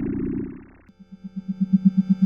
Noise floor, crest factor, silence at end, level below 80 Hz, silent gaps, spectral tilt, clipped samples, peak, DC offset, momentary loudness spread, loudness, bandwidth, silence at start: -49 dBFS; 18 dB; 0 s; -46 dBFS; none; -11.5 dB/octave; under 0.1%; -6 dBFS; under 0.1%; 20 LU; -23 LUFS; 5.2 kHz; 0 s